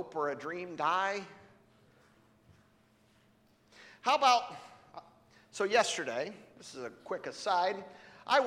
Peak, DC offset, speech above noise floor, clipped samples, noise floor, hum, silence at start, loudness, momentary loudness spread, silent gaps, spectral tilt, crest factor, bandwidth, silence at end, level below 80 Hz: -14 dBFS; under 0.1%; 34 dB; under 0.1%; -67 dBFS; none; 0 s; -32 LUFS; 24 LU; none; -2 dB/octave; 22 dB; 15 kHz; 0 s; -80 dBFS